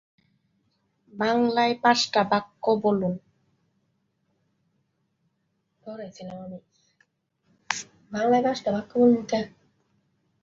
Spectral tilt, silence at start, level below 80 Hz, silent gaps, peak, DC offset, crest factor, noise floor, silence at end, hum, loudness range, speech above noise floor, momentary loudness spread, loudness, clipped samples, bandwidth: -4.5 dB/octave; 1.15 s; -68 dBFS; none; -2 dBFS; under 0.1%; 24 dB; -75 dBFS; 0.95 s; none; 20 LU; 51 dB; 19 LU; -24 LUFS; under 0.1%; 7.8 kHz